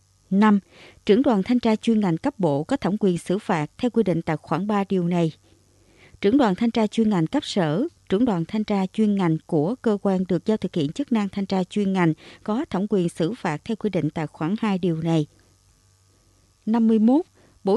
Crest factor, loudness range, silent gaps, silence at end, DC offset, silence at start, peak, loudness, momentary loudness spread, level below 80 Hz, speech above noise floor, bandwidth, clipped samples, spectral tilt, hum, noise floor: 16 dB; 3 LU; none; 0 s; under 0.1%; 0.3 s; -6 dBFS; -23 LUFS; 7 LU; -58 dBFS; 38 dB; 11.5 kHz; under 0.1%; -7.5 dB/octave; none; -59 dBFS